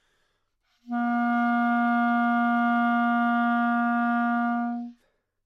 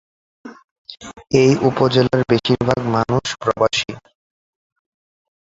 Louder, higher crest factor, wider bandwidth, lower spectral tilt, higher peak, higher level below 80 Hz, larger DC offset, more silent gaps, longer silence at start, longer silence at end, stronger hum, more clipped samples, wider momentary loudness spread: second, -24 LUFS vs -17 LUFS; second, 10 dB vs 20 dB; second, 4.7 kHz vs 7.8 kHz; first, -7 dB/octave vs -5.5 dB/octave; second, -14 dBFS vs 0 dBFS; second, -78 dBFS vs -48 dBFS; neither; second, none vs 0.64-0.85 s; first, 0.85 s vs 0.45 s; second, 0.55 s vs 1.45 s; neither; neither; second, 6 LU vs 19 LU